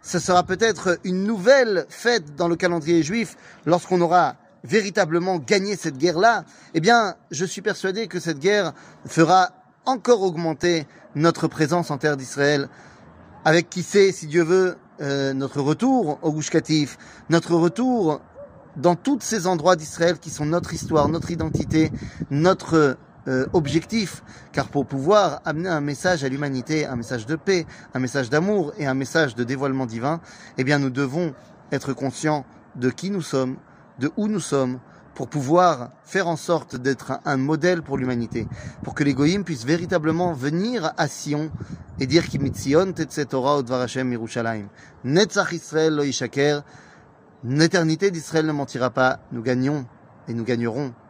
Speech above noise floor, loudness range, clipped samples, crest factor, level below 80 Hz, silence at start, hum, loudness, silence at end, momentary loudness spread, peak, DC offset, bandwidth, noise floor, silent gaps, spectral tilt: 29 dB; 3 LU; under 0.1%; 20 dB; -52 dBFS; 0.05 s; none; -22 LUFS; 0.15 s; 10 LU; -2 dBFS; under 0.1%; 15.5 kHz; -50 dBFS; none; -5.5 dB/octave